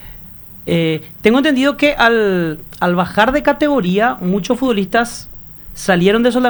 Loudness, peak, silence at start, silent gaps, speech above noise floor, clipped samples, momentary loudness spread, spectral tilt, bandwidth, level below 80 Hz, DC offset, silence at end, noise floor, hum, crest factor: -15 LUFS; 0 dBFS; 0 s; none; 21 dB; under 0.1%; 18 LU; -5.5 dB/octave; over 20 kHz; -40 dBFS; under 0.1%; 0 s; -35 dBFS; none; 14 dB